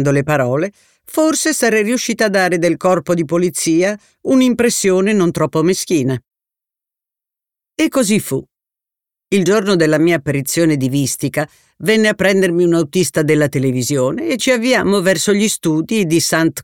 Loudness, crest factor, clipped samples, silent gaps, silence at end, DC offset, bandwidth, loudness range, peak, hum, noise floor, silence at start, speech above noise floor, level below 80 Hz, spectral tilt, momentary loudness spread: -15 LUFS; 14 dB; under 0.1%; none; 0 s; 0.1%; 18.5 kHz; 4 LU; -2 dBFS; none; -87 dBFS; 0 s; 72 dB; -54 dBFS; -4.5 dB/octave; 6 LU